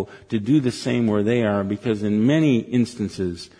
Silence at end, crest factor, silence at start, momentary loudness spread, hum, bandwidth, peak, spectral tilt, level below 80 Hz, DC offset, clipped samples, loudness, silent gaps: 0.15 s; 14 dB; 0 s; 8 LU; none; 10.5 kHz; -8 dBFS; -7 dB/octave; -56 dBFS; under 0.1%; under 0.1%; -21 LUFS; none